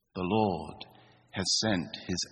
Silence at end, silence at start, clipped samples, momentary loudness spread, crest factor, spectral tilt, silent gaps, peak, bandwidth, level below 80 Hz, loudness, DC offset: 0.05 s; 0.15 s; under 0.1%; 18 LU; 18 dB; -3.5 dB/octave; none; -14 dBFS; 11 kHz; -62 dBFS; -30 LUFS; under 0.1%